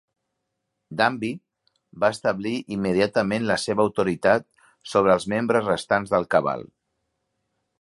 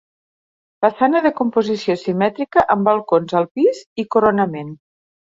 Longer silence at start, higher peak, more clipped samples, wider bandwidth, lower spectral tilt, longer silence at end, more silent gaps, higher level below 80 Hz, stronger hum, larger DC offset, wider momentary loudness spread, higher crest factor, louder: about the same, 0.9 s vs 0.8 s; about the same, -4 dBFS vs -2 dBFS; neither; first, 11.5 kHz vs 7.8 kHz; second, -5.5 dB/octave vs -7 dB/octave; first, 1.15 s vs 0.55 s; second, none vs 3.51-3.55 s, 3.86-3.96 s; about the same, -58 dBFS vs -56 dBFS; neither; neither; first, 9 LU vs 5 LU; first, 22 dB vs 16 dB; second, -23 LUFS vs -17 LUFS